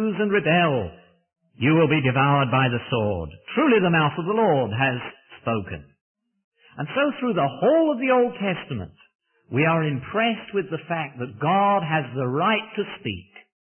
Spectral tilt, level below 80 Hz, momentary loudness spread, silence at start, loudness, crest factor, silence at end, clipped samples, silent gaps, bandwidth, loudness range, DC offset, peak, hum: -11 dB/octave; -56 dBFS; 13 LU; 0 s; -22 LUFS; 16 dB; 0.55 s; under 0.1%; 6.01-6.15 s, 6.44-6.52 s, 9.15-9.19 s; 3.4 kHz; 5 LU; under 0.1%; -8 dBFS; none